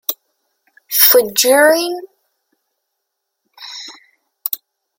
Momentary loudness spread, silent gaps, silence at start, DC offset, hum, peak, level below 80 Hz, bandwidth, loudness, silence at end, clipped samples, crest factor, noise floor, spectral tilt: 23 LU; none; 0.1 s; under 0.1%; none; 0 dBFS; -68 dBFS; 17 kHz; -12 LUFS; 0.45 s; under 0.1%; 18 dB; -75 dBFS; 0 dB/octave